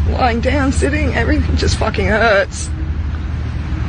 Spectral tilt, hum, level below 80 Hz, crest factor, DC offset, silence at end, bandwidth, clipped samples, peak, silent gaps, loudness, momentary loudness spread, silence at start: -5.5 dB/octave; none; -20 dBFS; 12 dB; under 0.1%; 0 s; 9.8 kHz; under 0.1%; -2 dBFS; none; -16 LUFS; 9 LU; 0 s